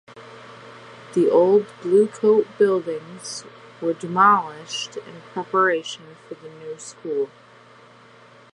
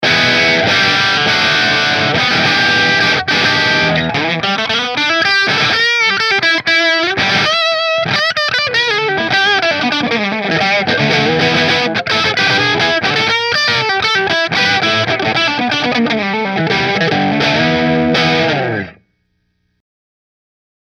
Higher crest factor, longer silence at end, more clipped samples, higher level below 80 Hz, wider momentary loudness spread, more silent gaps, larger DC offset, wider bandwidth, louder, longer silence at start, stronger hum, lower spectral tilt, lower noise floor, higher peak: about the same, 18 dB vs 14 dB; second, 1.25 s vs 1.9 s; neither; second, -76 dBFS vs -48 dBFS; first, 25 LU vs 4 LU; neither; neither; second, 11 kHz vs 15 kHz; second, -20 LUFS vs -12 LUFS; first, 0.15 s vs 0 s; neither; about the same, -4.5 dB/octave vs -3.5 dB/octave; second, -49 dBFS vs -64 dBFS; second, -4 dBFS vs 0 dBFS